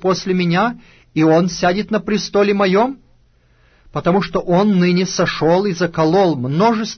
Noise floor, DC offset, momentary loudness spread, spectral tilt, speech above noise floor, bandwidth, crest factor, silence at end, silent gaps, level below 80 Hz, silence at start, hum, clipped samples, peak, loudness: -53 dBFS; under 0.1%; 7 LU; -6 dB/octave; 38 dB; 6.6 kHz; 12 dB; 0 s; none; -46 dBFS; 0 s; none; under 0.1%; -4 dBFS; -16 LUFS